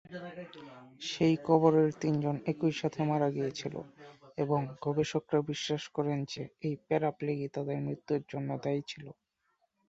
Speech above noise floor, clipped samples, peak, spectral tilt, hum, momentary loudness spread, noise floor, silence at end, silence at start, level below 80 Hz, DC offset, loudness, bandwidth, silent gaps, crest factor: 45 dB; under 0.1%; -10 dBFS; -6.5 dB/octave; none; 18 LU; -77 dBFS; 0.75 s; 0.1 s; -70 dBFS; under 0.1%; -32 LUFS; 8 kHz; none; 22 dB